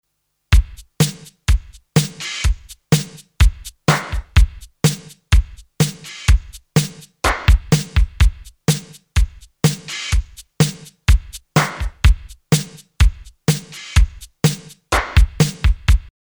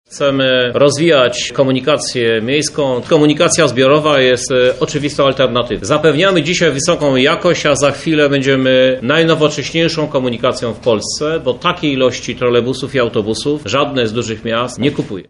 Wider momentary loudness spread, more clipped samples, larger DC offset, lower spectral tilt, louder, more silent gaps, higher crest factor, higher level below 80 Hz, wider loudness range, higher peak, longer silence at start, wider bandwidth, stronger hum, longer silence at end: about the same, 6 LU vs 6 LU; neither; neither; about the same, -4.5 dB/octave vs -4.5 dB/octave; second, -19 LUFS vs -13 LUFS; neither; about the same, 18 dB vs 14 dB; first, -20 dBFS vs -44 dBFS; about the same, 2 LU vs 4 LU; about the same, 0 dBFS vs 0 dBFS; first, 0.5 s vs 0.1 s; first, over 20 kHz vs 11.5 kHz; neither; first, 0.35 s vs 0.05 s